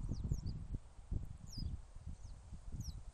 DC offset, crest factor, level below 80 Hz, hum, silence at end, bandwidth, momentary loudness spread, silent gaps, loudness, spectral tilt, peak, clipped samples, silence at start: under 0.1%; 22 dB; -48 dBFS; none; 0 s; 14 kHz; 12 LU; none; -48 LUFS; -6.5 dB/octave; -24 dBFS; under 0.1%; 0 s